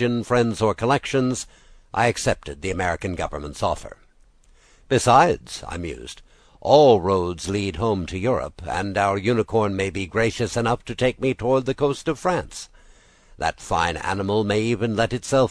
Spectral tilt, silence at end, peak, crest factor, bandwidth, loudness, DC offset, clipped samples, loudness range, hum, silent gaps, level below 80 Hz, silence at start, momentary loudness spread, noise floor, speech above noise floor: -5.5 dB/octave; 0 s; -2 dBFS; 20 dB; 11 kHz; -22 LUFS; under 0.1%; under 0.1%; 5 LU; none; none; -44 dBFS; 0 s; 14 LU; -54 dBFS; 33 dB